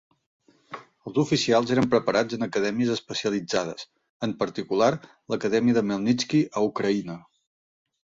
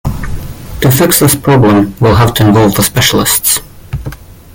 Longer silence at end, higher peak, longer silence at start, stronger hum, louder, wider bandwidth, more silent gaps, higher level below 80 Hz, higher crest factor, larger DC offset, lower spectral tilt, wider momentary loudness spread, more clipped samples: first, 1 s vs 0.25 s; second, -8 dBFS vs 0 dBFS; first, 0.7 s vs 0.05 s; neither; second, -25 LUFS vs -8 LUFS; second, 7.8 kHz vs over 20 kHz; first, 4.09-4.20 s vs none; second, -62 dBFS vs -28 dBFS; first, 18 dB vs 10 dB; neither; about the same, -5 dB/octave vs -4.5 dB/octave; about the same, 17 LU vs 16 LU; second, under 0.1% vs 0.1%